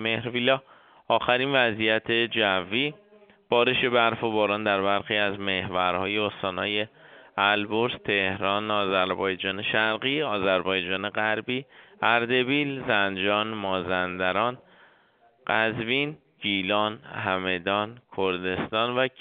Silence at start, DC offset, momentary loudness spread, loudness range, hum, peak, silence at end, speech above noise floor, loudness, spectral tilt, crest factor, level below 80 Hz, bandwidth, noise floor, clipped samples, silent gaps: 0 s; under 0.1%; 6 LU; 3 LU; none; -4 dBFS; 0.1 s; 36 dB; -25 LUFS; -2 dB/octave; 22 dB; -64 dBFS; 4.8 kHz; -61 dBFS; under 0.1%; none